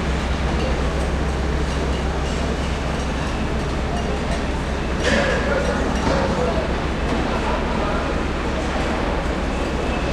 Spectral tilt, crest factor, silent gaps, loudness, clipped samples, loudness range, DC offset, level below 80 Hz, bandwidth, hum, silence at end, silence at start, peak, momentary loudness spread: -5.5 dB/octave; 16 dB; none; -22 LUFS; under 0.1%; 2 LU; under 0.1%; -26 dBFS; 11 kHz; none; 0 s; 0 s; -4 dBFS; 4 LU